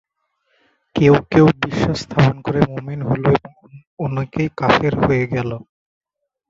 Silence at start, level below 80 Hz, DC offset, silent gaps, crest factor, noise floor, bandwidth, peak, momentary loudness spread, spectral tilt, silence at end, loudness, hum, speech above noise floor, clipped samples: 0.95 s; -42 dBFS; under 0.1%; 3.87-3.97 s; 18 dB; -68 dBFS; 7.6 kHz; 0 dBFS; 11 LU; -7.5 dB/octave; 0.9 s; -17 LUFS; none; 51 dB; under 0.1%